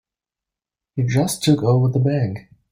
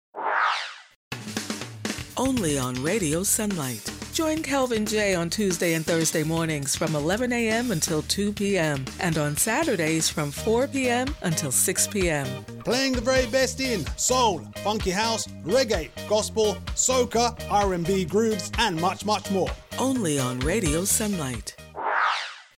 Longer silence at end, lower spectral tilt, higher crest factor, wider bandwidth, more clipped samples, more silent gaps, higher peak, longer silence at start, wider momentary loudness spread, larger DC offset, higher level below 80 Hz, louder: first, 0.3 s vs 0.15 s; first, -6.5 dB/octave vs -3.5 dB/octave; about the same, 16 dB vs 18 dB; about the same, 16 kHz vs 17 kHz; neither; second, none vs 0.96-1.11 s; first, -4 dBFS vs -8 dBFS; first, 0.95 s vs 0.15 s; first, 11 LU vs 8 LU; neither; second, -52 dBFS vs -42 dBFS; first, -19 LUFS vs -24 LUFS